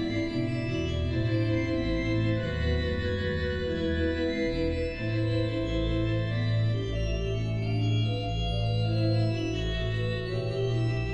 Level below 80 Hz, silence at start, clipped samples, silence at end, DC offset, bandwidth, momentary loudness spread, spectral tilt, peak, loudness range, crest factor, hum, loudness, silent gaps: -38 dBFS; 0 s; under 0.1%; 0 s; under 0.1%; 8.4 kHz; 3 LU; -7.5 dB/octave; -16 dBFS; 1 LU; 12 dB; none; -29 LUFS; none